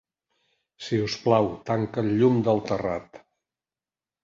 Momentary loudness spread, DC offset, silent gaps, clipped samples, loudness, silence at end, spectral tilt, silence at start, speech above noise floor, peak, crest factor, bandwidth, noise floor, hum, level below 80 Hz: 9 LU; under 0.1%; none; under 0.1%; -25 LUFS; 1.05 s; -7 dB/octave; 0.8 s; over 66 dB; -6 dBFS; 20 dB; 7.6 kHz; under -90 dBFS; none; -58 dBFS